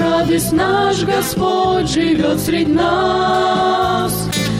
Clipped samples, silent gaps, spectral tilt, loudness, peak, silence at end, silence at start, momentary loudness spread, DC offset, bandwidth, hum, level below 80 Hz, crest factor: under 0.1%; none; -4.5 dB/octave; -15 LUFS; -6 dBFS; 0 s; 0 s; 2 LU; under 0.1%; 16.5 kHz; none; -38 dBFS; 10 dB